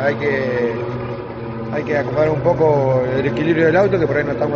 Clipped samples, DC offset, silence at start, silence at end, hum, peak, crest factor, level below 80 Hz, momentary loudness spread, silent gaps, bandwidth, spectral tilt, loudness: under 0.1%; under 0.1%; 0 s; 0 s; none; -2 dBFS; 14 dB; -44 dBFS; 11 LU; none; 6.8 kHz; -6.5 dB/octave; -18 LUFS